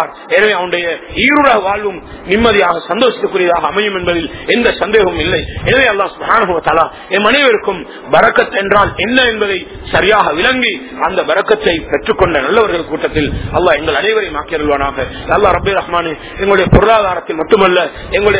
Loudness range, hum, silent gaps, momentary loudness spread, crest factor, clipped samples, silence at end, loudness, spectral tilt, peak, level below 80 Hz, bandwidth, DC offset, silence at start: 2 LU; none; none; 7 LU; 12 dB; 0.6%; 0 s; -12 LUFS; -9 dB/octave; 0 dBFS; -30 dBFS; 4 kHz; under 0.1%; 0 s